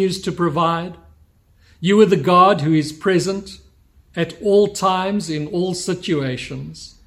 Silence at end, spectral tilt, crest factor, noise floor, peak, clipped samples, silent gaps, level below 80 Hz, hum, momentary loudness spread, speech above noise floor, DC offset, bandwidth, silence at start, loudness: 0.2 s; -5.5 dB/octave; 18 dB; -53 dBFS; -2 dBFS; under 0.1%; none; -52 dBFS; none; 16 LU; 36 dB; under 0.1%; 14.5 kHz; 0 s; -18 LUFS